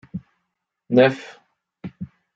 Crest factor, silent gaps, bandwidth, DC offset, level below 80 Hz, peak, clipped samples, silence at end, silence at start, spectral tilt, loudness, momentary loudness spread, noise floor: 20 dB; none; 7.6 kHz; under 0.1%; -64 dBFS; -4 dBFS; under 0.1%; 0.3 s; 0.15 s; -7.5 dB/octave; -18 LUFS; 23 LU; -78 dBFS